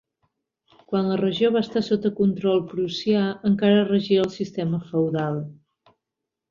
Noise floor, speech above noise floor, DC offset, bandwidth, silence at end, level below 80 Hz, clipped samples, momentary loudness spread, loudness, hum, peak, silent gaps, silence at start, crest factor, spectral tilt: -85 dBFS; 63 dB; under 0.1%; 7.2 kHz; 0.95 s; -62 dBFS; under 0.1%; 8 LU; -23 LUFS; none; -6 dBFS; none; 0.9 s; 16 dB; -7.5 dB/octave